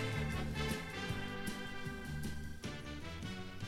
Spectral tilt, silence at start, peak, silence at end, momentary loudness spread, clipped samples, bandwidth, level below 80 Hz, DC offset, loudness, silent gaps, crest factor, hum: -5 dB/octave; 0 s; -26 dBFS; 0 s; 7 LU; under 0.1%; 16 kHz; -50 dBFS; under 0.1%; -42 LUFS; none; 16 dB; none